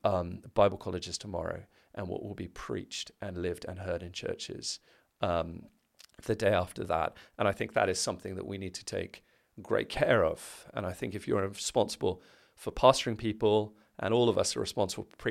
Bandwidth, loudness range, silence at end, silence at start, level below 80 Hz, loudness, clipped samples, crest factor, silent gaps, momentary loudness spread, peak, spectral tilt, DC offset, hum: 15.5 kHz; 9 LU; 0 s; 0.05 s; -56 dBFS; -32 LUFS; under 0.1%; 26 dB; none; 15 LU; -6 dBFS; -4.5 dB/octave; under 0.1%; none